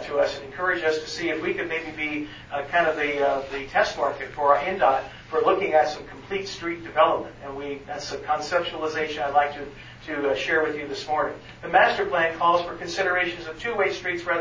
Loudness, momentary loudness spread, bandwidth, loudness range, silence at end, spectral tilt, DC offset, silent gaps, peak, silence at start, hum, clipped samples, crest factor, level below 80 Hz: -24 LUFS; 12 LU; 7.6 kHz; 3 LU; 0 s; -4 dB/octave; under 0.1%; none; -4 dBFS; 0 s; none; under 0.1%; 20 dB; -54 dBFS